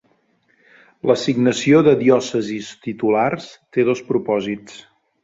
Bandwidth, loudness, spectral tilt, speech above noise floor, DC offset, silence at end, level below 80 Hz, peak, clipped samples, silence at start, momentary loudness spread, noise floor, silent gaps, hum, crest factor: 7.8 kHz; -18 LUFS; -6 dB/octave; 44 dB; under 0.1%; 0.45 s; -60 dBFS; -2 dBFS; under 0.1%; 1.05 s; 14 LU; -61 dBFS; none; none; 18 dB